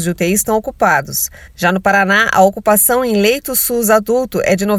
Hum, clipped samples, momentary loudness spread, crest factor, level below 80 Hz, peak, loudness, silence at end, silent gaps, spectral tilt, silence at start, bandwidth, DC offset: none; under 0.1%; 6 LU; 14 dB; -42 dBFS; 0 dBFS; -13 LUFS; 0 s; none; -3.5 dB/octave; 0 s; over 20 kHz; under 0.1%